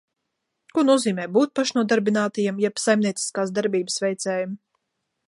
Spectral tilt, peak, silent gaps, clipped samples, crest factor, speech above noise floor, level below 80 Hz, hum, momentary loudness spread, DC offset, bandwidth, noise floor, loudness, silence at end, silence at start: -4.5 dB/octave; -6 dBFS; none; under 0.1%; 18 dB; 57 dB; -74 dBFS; none; 7 LU; under 0.1%; 11.5 kHz; -79 dBFS; -22 LUFS; 0.7 s; 0.75 s